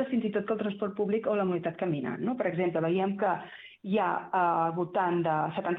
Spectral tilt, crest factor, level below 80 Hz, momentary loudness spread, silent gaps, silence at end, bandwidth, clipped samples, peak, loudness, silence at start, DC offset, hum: -10 dB/octave; 14 dB; -72 dBFS; 5 LU; none; 0 s; 4.1 kHz; under 0.1%; -14 dBFS; -30 LUFS; 0 s; under 0.1%; none